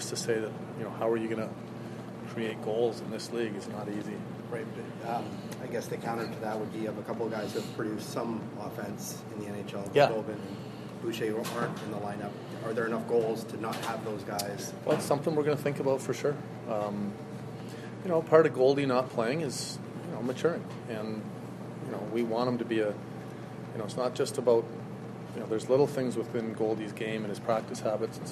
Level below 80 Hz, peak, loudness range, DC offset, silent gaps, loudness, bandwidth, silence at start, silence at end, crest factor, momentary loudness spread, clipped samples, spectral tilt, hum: -70 dBFS; -8 dBFS; 7 LU; under 0.1%; none; -32 LUFS; 13 kHz; 0 s; 0 s; 24 dB; 13 LU; under 0.1%; -5.5 dB/octave; none